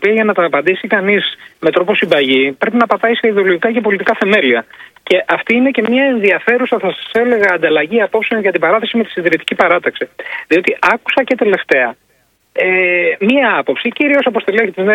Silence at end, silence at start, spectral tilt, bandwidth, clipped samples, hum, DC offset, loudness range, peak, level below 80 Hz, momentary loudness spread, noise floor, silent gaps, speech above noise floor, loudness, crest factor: 0 s; 0 s; -6 dB/octave; 12.5 kHz; 0.1%; none; under 0.1%; 1 LU; 0 dBFS; -58 dBFS; 5 LU; -57 dBFS; none; 44 dB; -13 LUFS; 14 dB